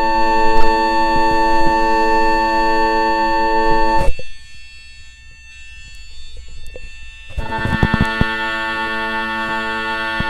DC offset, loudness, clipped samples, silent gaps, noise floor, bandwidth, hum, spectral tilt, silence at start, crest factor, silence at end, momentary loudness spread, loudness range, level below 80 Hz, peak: under 0.1%; -16 LUFS; under 0.1%; none; -38 dBFS; 9.4 kHz; 60 Hz at -45 dBFS; -5.5 dB/octave; 0 s; 14 dB; 0 s; 22 LU; 15 LU; -26 dBFS; 0 dBFS